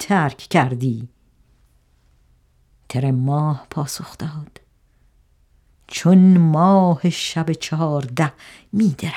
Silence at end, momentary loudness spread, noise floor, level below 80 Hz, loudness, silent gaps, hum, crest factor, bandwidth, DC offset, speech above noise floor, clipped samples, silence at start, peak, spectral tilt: 0 s; 17 LU; -57 dBFS; -56 dBFS; -18 LUFS; none; none; 18 dB; 14 kHz; under 0.1%; 40 dB; under 0.1%; 0 s; -2 dBFS; -6.5 dB/octave